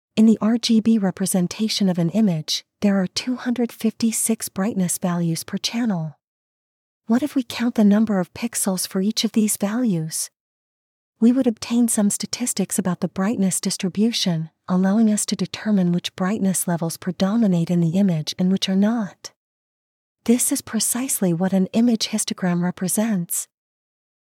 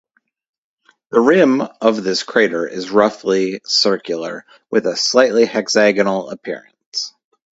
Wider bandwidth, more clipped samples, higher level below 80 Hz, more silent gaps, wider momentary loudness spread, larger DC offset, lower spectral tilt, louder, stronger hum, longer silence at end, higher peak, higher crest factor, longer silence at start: first, 16.5 kHz vs 8 kHz; neither; about the same, -66 dBFS vs -62 dBFS; first, 6.24-7.00 s, 10.40-11.13 s, 19.36-20.15 s vs 6.86-6.92 s; second, 7 LU vs 14 LU; neither; about the same, -4.5 dB/octave vs -3.5 dB/octave; second, -21 LUFS vs -16 LUFS; neither; first, 0.85 s vs 0.45 s; second, -4 dBFS vs 0 dBFS; about the same, 16 dB vs 18 dB; second, 0.15 s vs 1.1 s